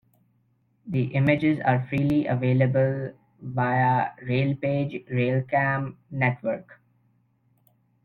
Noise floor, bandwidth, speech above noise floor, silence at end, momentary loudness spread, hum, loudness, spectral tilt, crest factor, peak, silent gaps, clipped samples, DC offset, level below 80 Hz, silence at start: -67 dBFS; 4.5 kHz; 43 dB; 1.3 s; 10 LU; none; -25 LUFS; -9.5 dB/octave; 20 dB; -6 dBFS; none; under 0.1%; under 0.1%; -58 dBFS; 0.85 s